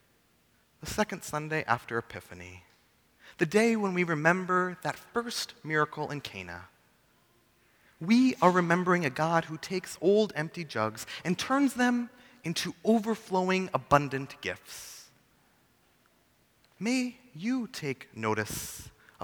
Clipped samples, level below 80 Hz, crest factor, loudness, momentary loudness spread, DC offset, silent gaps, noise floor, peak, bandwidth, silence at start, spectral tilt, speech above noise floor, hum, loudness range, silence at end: under 0.1%; -62 dBFS; 26 dB; -29 LUFS; 16 LU; under 0.1%; none; -67 dBFS; -6 dBFS; over 20 kHz; 0.8 s; -5 dB/octave; 38 dB; none; 8 LU; 0 s